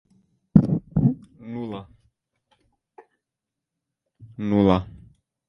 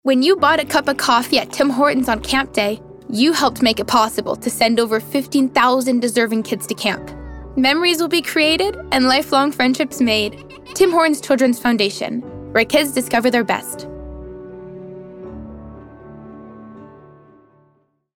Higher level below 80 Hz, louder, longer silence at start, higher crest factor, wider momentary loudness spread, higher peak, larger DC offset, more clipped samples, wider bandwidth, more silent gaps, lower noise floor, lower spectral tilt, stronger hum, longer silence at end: about the same, -46 dBFS vs -44 dBFS; second, -22 LUFS vs -17 LUFS; first, 0.55 s vs 0.05 s; first, 26 dB vs 16 dB; about the same, 19 LU vs 20 LU; about the same, 0 dBFS vs -2 dBFS; neither; neither; second, 5.8 kHz vs 18.5 kHz; neither; first, -86 dBFS vs -60 dBFS; first, -10 dB/octave vs -3.5 dB/octave; neither; second, 0.5 s vs 1.3 s